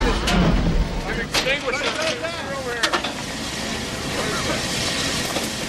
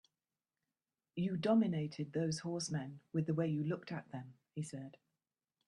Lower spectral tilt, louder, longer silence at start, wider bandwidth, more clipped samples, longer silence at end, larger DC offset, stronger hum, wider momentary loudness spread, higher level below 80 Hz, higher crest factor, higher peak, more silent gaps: second, -3.5 dB/octave vs -6.5 dB/octave; first, -22 LUFS vs -38 LUFS; second, 0 s vs 1.15 s; first, 16 kHz vs 11 kHz; neither; second, 0 s vs 0.75 s; neither; neither; second, 7 LU vs 17 LU; first, -30 dBFS vs -78 dBFS; about the same, 16 dB vs 18 dB; first, -6 dBFS vs -20 dBFS; neither